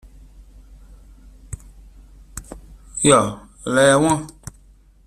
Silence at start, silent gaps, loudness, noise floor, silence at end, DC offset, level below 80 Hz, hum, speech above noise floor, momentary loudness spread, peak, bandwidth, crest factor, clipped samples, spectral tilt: 1.5 s; none; -17 LUFS; -50 dBFS; 0.8 s; under 0.1%; -44 dBFS; none; 34 dB; 24 LU; 0 dBFS; 14.5 kHz; 22 dB; under 0.1%; -4 dB/octave